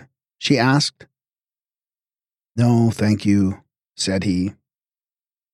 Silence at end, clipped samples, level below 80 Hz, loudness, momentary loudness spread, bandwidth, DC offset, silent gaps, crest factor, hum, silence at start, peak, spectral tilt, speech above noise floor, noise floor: 1.05 s; under 0.1%; -58 dBFS; -19 LUFS; 11 LU; 12.5 kHz; under 0.1%; none; 18 dB; none; 0.4 s; -4 dBFS; -5.5 dB/octave; over 72 dB; under -90 dBFS